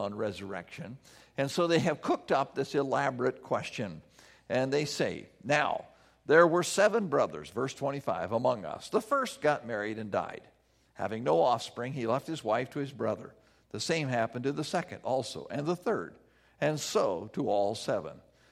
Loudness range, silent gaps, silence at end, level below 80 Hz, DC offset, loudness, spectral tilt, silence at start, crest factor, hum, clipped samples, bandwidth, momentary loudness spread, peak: 5 LU; none; 0.3 s; -70 dBFS; under 0.1%; -31 LUFS; -5 dB/octave; 0 s; 22 dB; none; under 0.1%; 15 kHz; 14 LU; -8 dBFS